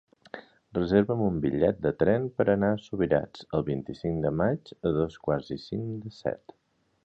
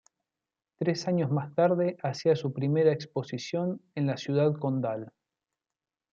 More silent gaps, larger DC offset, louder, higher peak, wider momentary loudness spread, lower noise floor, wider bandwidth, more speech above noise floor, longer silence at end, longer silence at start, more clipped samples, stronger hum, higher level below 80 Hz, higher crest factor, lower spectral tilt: neither; neither; about the same, -28 LUFS vs -29 LUFS; first, -8 dBFS vs -12 dBFS; about the same, 11 LU vs 9 LU; second, -47 dBFS vs under -90 dBFS; about the same, 7.6 kHz vs 7.6 kHz; second, 20 dB vs over 62 dB; second, 0.7 s vs 1.05 s; second, 0.35 s vs 0.8 s; neither; neither; first, -52 dBFS vs -76 dBFS; about the same, 20 dB vs 18 dB; first, -9 dB/octave vs -7 dB/octave